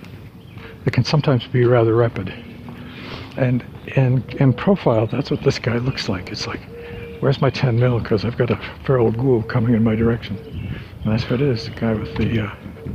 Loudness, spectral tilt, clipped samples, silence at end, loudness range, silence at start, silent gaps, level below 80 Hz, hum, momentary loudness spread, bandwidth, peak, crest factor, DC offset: -20 LUFS; -7.5 dB/octave; under 0.1%; 0 s; 2 LU; 0 s; none; -42 dBFS; none; 16 LU; 7.4 kHz; -2 dBFS; 16 dB; under 0.1%